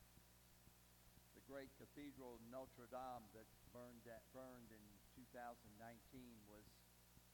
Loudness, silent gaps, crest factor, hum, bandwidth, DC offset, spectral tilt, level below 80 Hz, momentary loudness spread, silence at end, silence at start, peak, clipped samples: -61 LUFS; none; 18 dB; 60 Hz at -75 dBFS; 18 kHz; under 0.1%; -5 dB/octave; -76 dBFS; 12 LU; 0 s; 0 s; -42 dBFS; under 0.1%